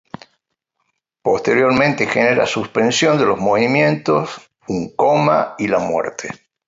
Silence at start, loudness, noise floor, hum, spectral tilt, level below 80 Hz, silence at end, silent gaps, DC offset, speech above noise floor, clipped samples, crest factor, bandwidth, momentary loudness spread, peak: 1.25 s; -16 LUFS; -73 dBFS; none; -5 dB/octave; -54 dBFS; 0.3 s; none; under 0.1%; 56 dB; under 0.1%; 16 dB; 8 kHz; 11 LU; -2 dBFS